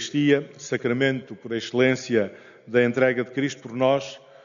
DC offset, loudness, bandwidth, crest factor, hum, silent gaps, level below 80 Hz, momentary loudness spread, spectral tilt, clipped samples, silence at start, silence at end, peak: under 0.1%; -24 LUFS; 7.4 kHz; 18 dB; none; none; -68 dBFS; 10 LU; -4.5 dB/octave; under 0.1%; 0 s; 0.25 s; -6 dBFS